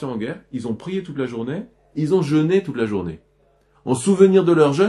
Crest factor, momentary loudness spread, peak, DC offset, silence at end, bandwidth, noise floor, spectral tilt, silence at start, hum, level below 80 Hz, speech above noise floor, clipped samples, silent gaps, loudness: 18 dB; 16 LU; -2 dBFS; under 0.1%; 0 s; 11.5 kHz; -59 dBFS; -7 dB/octave; 0 s; none; -56 dBFS; 40 dB; under 0.1%; none; -20 LUFS